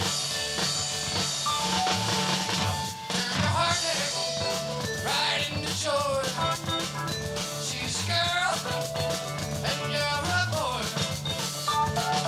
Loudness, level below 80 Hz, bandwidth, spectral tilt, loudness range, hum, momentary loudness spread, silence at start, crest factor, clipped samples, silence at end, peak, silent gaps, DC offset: -27 LUFS; -52 dBFS; 17 kHz; -2.5 dB/octave; 2 LU; none; 5 LU; 0 s; 16 dB; under 0.1%; 0 s; -12 dBFS; none; under 0.1%